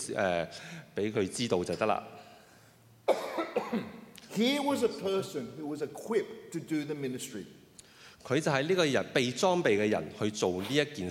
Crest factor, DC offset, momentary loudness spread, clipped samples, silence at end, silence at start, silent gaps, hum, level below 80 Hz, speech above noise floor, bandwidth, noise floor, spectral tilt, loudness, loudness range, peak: 20 dB; under 0.1%; 14 LU; under 0.1%; 0 s; 0 s; none; none; -72 dBFS; 28 dB; 16.5 kHz; -59 dBFS; -4.5 dB/octave; -31 LUFS; 5 LU; -12 dBFS